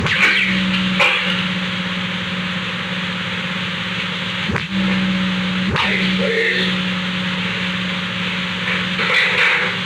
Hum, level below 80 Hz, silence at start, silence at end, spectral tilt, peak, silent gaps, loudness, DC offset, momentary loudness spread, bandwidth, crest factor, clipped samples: none; -46 dBFS; 0 s; 0 s; -4.5 dB/octave; -6 dBFS; none; -17 LUFS; under 0.1%; 8 LU; 11.5 kHz; 14 dB; under 0.1%